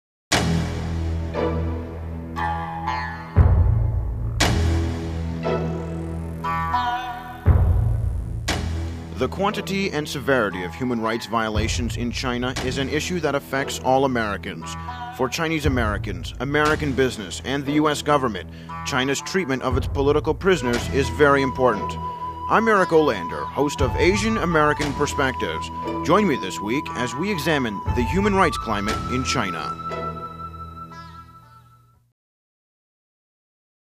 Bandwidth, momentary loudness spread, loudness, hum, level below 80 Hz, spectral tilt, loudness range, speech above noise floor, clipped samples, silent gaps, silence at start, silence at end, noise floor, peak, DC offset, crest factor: 15.5 kHz; 11 LU; -23 LUFS; none; -32 dBFS; -5.5 dB/octave; 4 LU; 32 dB; under 0.1%; none; 0.3 s; 2.6 s; -54 dBFS; -2 dBFS; under 0.1%; 20 dB